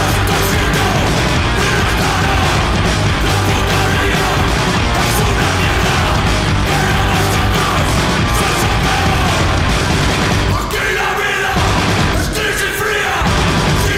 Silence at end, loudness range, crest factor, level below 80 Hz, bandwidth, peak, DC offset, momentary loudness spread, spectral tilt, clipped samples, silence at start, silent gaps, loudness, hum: 0 s; 1 LU; 12 dB; -22 dBFS; 16 kHz; 0 dBFS; under 0.1%; 1 LU; -4.5 dB/octave; under 0.1%; 0 s; none; -14 LUFS; none